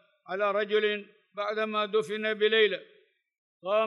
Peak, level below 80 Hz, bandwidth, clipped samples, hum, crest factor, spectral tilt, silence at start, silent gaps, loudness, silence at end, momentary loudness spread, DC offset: -12 dBFS; under -90 dBFS; 11.5 kHz; under 0.1%; none; 18 dB; -4.5 dB/octave; 0.3 s; 3.38-3.60 s; -28 LUFS; 0 s; 14 LU; under 0.1%